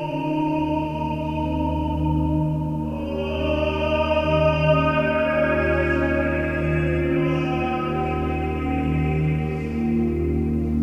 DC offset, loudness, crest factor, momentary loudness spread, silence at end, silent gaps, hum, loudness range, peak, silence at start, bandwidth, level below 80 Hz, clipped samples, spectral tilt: under 0.1%; -22 LUFS; 14 dB; 6 LU; 0 s; none; none; 4 LU; -8 dBFS; 0 s; 6.6 kHz; -32 dBFS; under 0.1%; -8.5 dB/octave